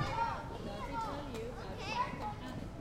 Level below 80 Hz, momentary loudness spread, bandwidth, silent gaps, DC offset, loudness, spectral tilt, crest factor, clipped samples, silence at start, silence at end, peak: -50 dBFS; 7 LU; 16 kHz; none; under 0.1%; -40 LUFS; -5.5 dB/octave; 18 dB; under 0.1%; 0 s; 0 s; -22 dBFS